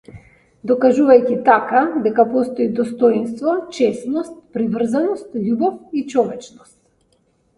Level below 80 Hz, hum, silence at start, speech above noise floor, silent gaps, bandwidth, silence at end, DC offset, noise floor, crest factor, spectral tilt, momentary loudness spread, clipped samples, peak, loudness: -60 dBFS; none; 0.1 s; 44 dB; none; 11.5 kHz; 1.1 s; under 0.1%; -61 dBFS; 18 dB; -6.5 dB/octave; 11 LU; under 0.1%; 0 dBFS; -17 LUFS